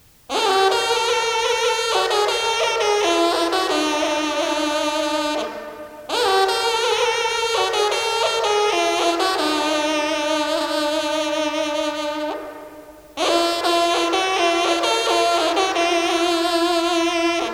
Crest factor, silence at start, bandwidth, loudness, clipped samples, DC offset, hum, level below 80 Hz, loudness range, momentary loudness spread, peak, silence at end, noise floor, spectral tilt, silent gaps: 16 dB; 0.3 s; 16.5 kHz; -19 LUFS; under 0.1%; under 0.1%; none; -56 dBFS; 3 LU; 6 LU; -4 dBFS; 0 s; -41 dBFS; -1 dB/octave; none